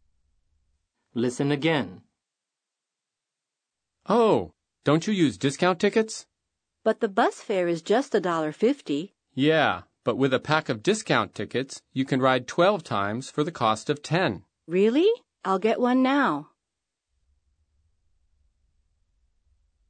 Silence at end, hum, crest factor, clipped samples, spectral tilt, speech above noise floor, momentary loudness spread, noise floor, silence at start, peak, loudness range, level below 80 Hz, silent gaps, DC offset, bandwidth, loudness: 3.45 s; none; 22 dB; under 0.1%; -5.5 dB/octave; 63 dB; 9 LU; -87 dBFS; 1.15 s; -4 dBFS; 5 LU; -68 dBFS; none; under 0.1%; 9.6 kHz; -25 LUFS